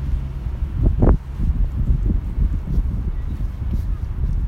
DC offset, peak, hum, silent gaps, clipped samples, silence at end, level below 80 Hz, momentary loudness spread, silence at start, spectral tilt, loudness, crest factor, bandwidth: under 0.1%; -2 dBFS; none; none; under 0.1%; 0 s; -20 dBFS; 9 LU; 0 s; -10 dB/octave; -23 LUFS; 16 dB; 3.9 kHz